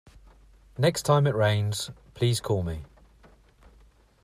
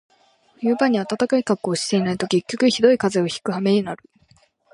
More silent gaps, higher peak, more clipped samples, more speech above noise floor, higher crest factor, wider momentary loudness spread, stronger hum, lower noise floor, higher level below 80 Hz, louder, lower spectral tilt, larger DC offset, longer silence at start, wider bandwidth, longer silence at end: neither; second, -10 dBFS vs -2 dBFS; neither; second, 33 dB vs 38 dB; about the same, 18 dB vs 18 dB; first, 14 LU vs 7 LU; neither; about the same, -58 dBFS vs -58 dBFS; first, -52 dBFS vs -62 dBFS; second, -26 LUFS vs -20 LUFS; about the same, -5.5 dB/octave vs -5 dB/octave; neither; first, 0.8 s vs 0.6 s; first, 14.5 kHz vs 11.5 kHz; first, 1.4 s vs 0.8 s